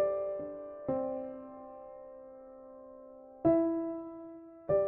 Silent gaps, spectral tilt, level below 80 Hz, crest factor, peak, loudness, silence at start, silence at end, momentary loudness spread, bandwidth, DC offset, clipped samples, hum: none; -10.5 dB/octave; -64 dBFS; 18 dB; -16 dBFS; -34 LUFS; 0 s; 0 s; 22 LU; 2.8 kHz; under 0.1%; under 0.1%; none